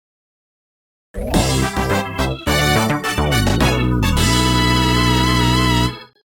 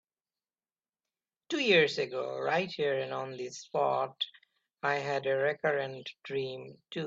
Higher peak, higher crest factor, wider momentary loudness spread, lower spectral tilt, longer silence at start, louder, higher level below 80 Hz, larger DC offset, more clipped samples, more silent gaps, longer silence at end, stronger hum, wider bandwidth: first, -2 dBFS vs -12 dBFS; about the same, 16 dB vs 20 dB; second, 6 LU vs 14 LU; about the same, -4.5 dB/octave vs -4.5 dB/octave; second, 1.15 s vs 1.5 s; first, -16 LUFS vs -31 LUFS; first, -26 dBFS vs -78 dBFS; neither; neither; neither; first, 0.35 s vs 0 s; neither; first, 17.5 kHz vs 7.8 kHz